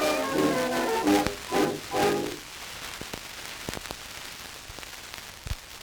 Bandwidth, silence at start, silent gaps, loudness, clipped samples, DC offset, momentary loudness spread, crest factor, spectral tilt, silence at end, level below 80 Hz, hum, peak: over 20 kHz; 0 s; none; -29 LUFS; under 0.1%; under 0.1%; 14 LU; 24 dB; -3.5 dB/octave; 0 s; -50 dBFS; none; -6 dBFS